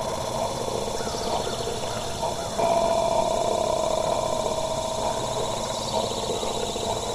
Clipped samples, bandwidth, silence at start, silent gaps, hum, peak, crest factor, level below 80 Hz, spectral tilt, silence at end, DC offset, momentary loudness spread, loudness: under 0.1%; 14.5 kHz; 0 s; none; none; -10 dBFS; 16 dB; -44 dBFS; -3.5 dB/octave; 0 s; under 0.1%; 6 LU; -26 LUFS